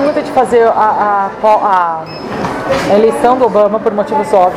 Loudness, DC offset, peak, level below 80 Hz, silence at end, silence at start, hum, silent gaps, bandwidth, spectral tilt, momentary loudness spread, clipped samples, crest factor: -11 LUFS; under 0.1%; 0 dBFS; -44 dBFS; 0 s; 0 s; none; none; 14.5 kHz; -5.5 dB/octave; 8 LU; under 0.1%; 10 dB